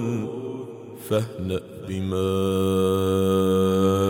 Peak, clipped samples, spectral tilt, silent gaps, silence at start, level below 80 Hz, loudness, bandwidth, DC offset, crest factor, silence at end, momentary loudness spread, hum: -10 dBFS; under 0.1%; -7 dB/octave; none; 0 s; -58 dBFS; -24 LUFS; 17 kHz; under 0.1%; 14 dB; 0 s; 13 LU; none